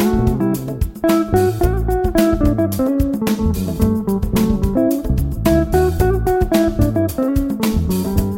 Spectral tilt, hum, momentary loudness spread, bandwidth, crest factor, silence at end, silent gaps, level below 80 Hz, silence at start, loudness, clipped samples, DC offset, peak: -7 dB/octave; none; 4 LU; 16.5 kHz; 14 dB; 0 s; none; -24 dBFS; 0 s; -17 LUFS; under 0.1%; under 0.1%; -2 dBFS